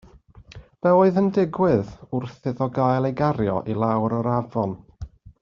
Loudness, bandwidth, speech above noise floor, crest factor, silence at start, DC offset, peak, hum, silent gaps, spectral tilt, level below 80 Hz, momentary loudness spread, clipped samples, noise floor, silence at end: -22 LUFS; 7 kHz; 27 dB; 18 dB; 0.5 s; under 0.1%; -6 dBFS; none; none; -8 dB/octave; -50 dBFS; 12 LU; under 0.1%; -48 dBFS; 0.1 s